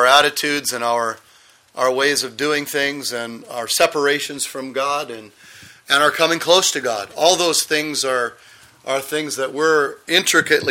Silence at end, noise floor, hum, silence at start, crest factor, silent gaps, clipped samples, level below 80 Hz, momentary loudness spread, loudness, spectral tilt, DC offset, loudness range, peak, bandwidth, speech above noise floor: 0 s; -51 dBFS; none; 0 s; 20 dB; none; under 0.1%; -64 dBFS; 11 LU; -18 LUFS; -1.5 dB/octave; under 0.1%; 4 LU; 0 dBFS; 16.5 kHz; 32 dB